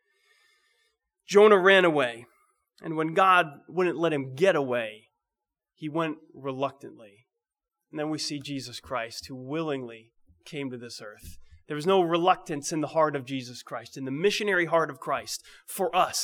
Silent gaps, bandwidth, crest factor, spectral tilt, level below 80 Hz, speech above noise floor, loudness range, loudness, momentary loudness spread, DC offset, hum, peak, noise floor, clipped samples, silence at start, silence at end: none; 18.5 kHz; 22 dB; -4 dB/octave; -64 dBFS; 62 dB; 12 LU; -26 LUFS; 19 LU; under 0.1%; none; -6 dBFS; -89 dBFS; under 0.1%; 1.3 s; 0 s